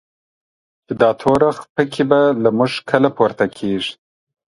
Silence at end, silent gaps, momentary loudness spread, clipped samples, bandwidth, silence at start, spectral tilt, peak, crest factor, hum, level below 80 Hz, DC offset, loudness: 0.55 s; 1.70-1.75 s; 7 LU; under 0.1%; 11.5 kHz; 0.9 s; -6.5 dB/octave; 0 dBFS; 18 dB; none; -54 dBFS; under 0.1%; -17 LUFS